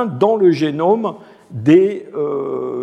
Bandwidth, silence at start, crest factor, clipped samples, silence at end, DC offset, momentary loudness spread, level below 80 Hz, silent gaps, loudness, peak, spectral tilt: 8.2 kHz; 0 s; 14 dB; under 0.1%; 0 s; under 0.1%; 10 LU; -66 dBFS; none; -16 LUFS; -2 dBFS; -8 dB/octave